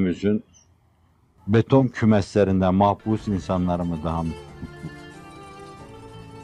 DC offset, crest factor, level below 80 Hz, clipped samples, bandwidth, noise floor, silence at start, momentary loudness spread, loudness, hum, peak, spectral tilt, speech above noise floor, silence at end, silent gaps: under 0.1%; 18 dB; -48 dBFS; under 0.1%; 10.5 kHz; -60 dBFS; 0 s; 23 LU; -22 LUFS; none; -4 dBFS; -8 dB/octave; 39 dB; 0 s; none